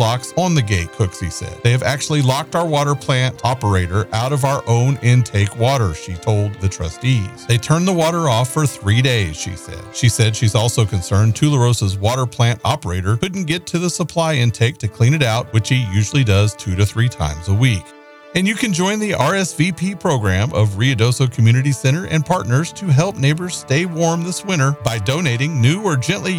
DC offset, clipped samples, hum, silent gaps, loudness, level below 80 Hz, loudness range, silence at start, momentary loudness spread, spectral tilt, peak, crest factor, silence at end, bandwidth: 0.1%; under 0.1%; none; none; -17 LUFS; -42 dBFS; 2 LU; 0 s; 5 LU; -5.5 dB/octave; -2 dBFS; 14 dB; 0 s; 15 kHz